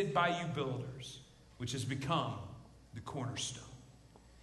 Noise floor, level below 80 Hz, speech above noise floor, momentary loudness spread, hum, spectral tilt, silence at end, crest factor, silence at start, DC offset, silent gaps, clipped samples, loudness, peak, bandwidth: -60 dBFS; -62 dBFS; 22 dB; 19 LU; none; -4.5 dB/octave; 0 s; 22 dB; 0 s; under 0.1%; none; under 0.1%; -39 LUFS; -18 dBFS; 12 kHz